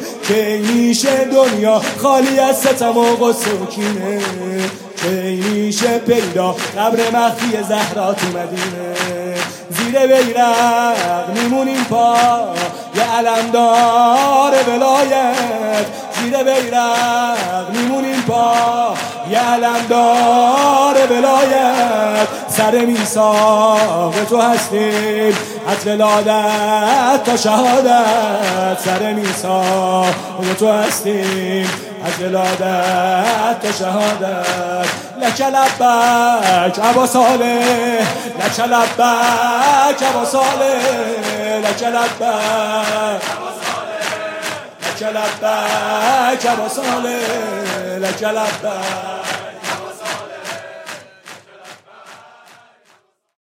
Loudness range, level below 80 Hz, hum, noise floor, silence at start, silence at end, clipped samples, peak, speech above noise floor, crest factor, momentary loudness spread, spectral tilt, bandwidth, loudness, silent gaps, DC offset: 6 LU; -72 dBFS; none; -55 dBFS; 0 s; 1.3 s; under 0.1%; 0 dBFS; 41 dB; 14 dB; 10 LU; -3.5 dB/octave; 16.5 kHz; -15 LUFS; none; under 0.1%